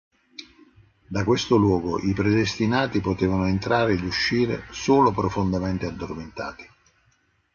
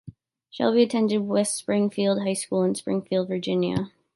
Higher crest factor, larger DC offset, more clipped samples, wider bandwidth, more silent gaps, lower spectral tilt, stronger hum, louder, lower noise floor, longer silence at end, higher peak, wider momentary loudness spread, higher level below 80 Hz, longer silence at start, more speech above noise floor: about the same, 18 dB vs 16 dB; neither; neither; second, 7.2 kHz vs 11.5 kHz; neither; about the same, -6 dB/octave vs -5.5 dB/octave; neither; about the same, -23 LUFS vs -24 LUFS; first, -65 dBFS vs -47 dBFS; first, 0.9 s vs 0.25 s; about the same, -6 dBFS vs -8 dBFS; first, 14 LU vs 6 LU; first, -44 dBFS vs -62 dBFS; first, 0.4 s vs 0.05 s; first, 43 dB vs 23 dB